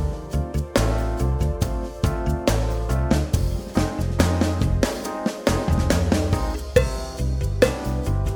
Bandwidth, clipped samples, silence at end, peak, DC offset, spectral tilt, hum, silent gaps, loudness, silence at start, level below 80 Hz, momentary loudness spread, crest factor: over 20 kHz; under 0.1%; 0 s; -2 dBFS; under 0.1%; -6 dB/octave; none; none; -23 LUFS; 0 s; -26 dBFS; 6 LU; 20 dB